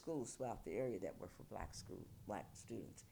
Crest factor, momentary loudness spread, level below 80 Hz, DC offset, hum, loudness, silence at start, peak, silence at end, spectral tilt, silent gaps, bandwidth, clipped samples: 16 dB; 9 LU; -64 dBFS; under 0.1%; none; -49 LUFS; 0 s; -32 dBFS; 0 s; -5.5 dB/octave; none; over 20 kHz; under 0.1%